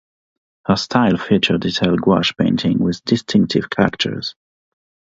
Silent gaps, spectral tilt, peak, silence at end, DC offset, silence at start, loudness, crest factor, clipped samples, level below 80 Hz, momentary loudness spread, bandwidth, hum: none; -6 dB/octave; 0 dBFS; 0.8 s; under 0.1%; 0.7 s; -17 LUFS; 18 dB; under 0.1%; -46 dBFS; 6 LU; 7.8 kHz; none